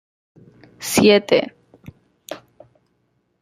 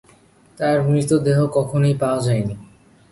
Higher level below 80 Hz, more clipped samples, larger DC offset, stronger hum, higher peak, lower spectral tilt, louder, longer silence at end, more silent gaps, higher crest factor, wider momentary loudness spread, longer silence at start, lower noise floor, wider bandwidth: second, -58 dBFS vs -52 dBFS; neither; neither; neither; first, 0 dBFS vs -4 dBFS; second, -4 dB/octave vs -7 dB/octave; first, -16 LUFS vs -19 LUFS; first, 1.05 s vs 0.45 s; neither; first, 22 dB vs 16 dB; first, 23 LU vs 7 LU; first, 0.8 s vs 0.6 s; first, -67 dBFS vs -52 dBFS; first, 15.5 kHz vs 11.5 kHz